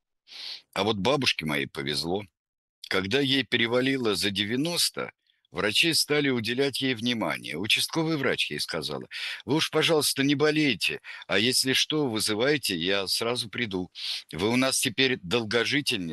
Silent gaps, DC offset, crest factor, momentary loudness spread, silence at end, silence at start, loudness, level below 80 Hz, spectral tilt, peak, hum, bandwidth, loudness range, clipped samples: 2.39-2.82 s; under 0.1%; 20 dB; 9 LU; 0 s; 0.3 s; -25 LUFS; -64 dBFS; -3 dB/octave; -8 dBFS; none; 12.5 kHz; 3 LU; under 0.1%